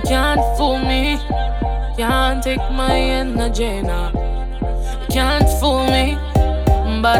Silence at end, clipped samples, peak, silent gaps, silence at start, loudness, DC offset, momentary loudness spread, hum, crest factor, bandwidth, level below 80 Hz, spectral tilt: 0 s; under 0.1%; 0 dBFS; none; 0 s; -18 LUFS; under 0.1%; 8 LU; none; 16 dB; 16.5 kHz; -20 dBFS; -5.5 dB/octave